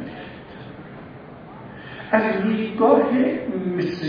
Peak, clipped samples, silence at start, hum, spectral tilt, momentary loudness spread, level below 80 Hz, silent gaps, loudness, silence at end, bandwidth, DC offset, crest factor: -2 dBFS; under 0.1%; 0 s; none; -8.5 dB/octave; 23 LU; -56 dBFS; none; -20 LUFS; 0 s; 5.2 kHz; under 0.1%; 20 dB